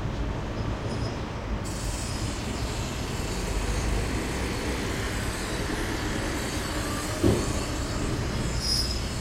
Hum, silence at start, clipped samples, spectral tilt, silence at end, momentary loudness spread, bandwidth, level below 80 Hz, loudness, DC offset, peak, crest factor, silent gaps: none; 0 s; under 0.1%; -4.5 dB/octave; 0 s; 6 LU; 16 kHz; -34 dBFS; -29 LUFS; under 0.1%; -8 dBFS; 20 dB; none